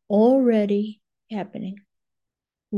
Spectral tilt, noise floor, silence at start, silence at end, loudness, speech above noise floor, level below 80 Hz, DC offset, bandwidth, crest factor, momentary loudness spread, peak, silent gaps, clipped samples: -9 dB/octave; -86 dBFS; 0.1 s; 0 s; -21 LUFS; 62 dB; -74 dBFS; under 0.1%; 5.4 kHz; 14 dB; 18 LU; -8 dBFS; none; under 0.1%